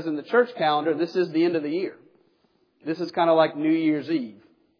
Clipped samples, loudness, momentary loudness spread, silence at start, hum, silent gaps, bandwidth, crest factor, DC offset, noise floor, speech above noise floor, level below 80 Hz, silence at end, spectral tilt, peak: under 0.1%; -24 LUFS; 11 LU; 0 s; none; none; 5.4 kHz; 18 dB; under 0.1%; -66 dBFS; 43 dB; -84 dBFS; 0.45 s; -7.5 dB/octave; -6 dBFS